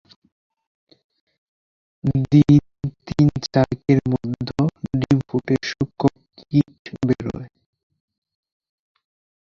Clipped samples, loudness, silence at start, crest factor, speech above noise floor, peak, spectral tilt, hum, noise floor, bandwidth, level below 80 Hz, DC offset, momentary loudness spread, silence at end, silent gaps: under 0.1%; -20 LUFS; 2.05 s; 20 dB; over 73 dB; -2 dBFS; -8 dB/octave; none; under -90 dBFS; 7.2 kHz; -46 dBFS; under 0.1%; 11 LU; 2 s; 6.79-6.85 s